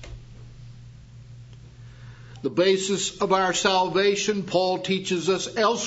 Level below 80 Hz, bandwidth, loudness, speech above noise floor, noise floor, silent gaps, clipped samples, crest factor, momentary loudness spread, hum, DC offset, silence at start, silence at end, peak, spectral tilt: -52 dBFS; 8 kHz; -23 LUFS; 22 dB; -45 dBFS; none; under 0.1%; 20 dB; 24 LU; none; under 0.1%; 0 s; 0 s; -4 dBFS; -3.5 dB/octave